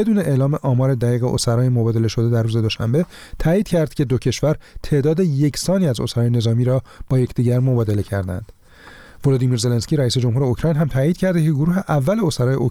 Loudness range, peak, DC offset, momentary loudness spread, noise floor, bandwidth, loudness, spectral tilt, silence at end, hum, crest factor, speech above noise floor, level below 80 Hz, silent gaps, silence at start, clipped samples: 2 LU; -6 dBFS; 0.2%; 4 LU; -43 dBFS; 15 kHz; -19 LUFS; -7 dB/octave; 0 s; none; 12 dB; 25 dB; -40 dBFS; none; 0 s; under 0.1%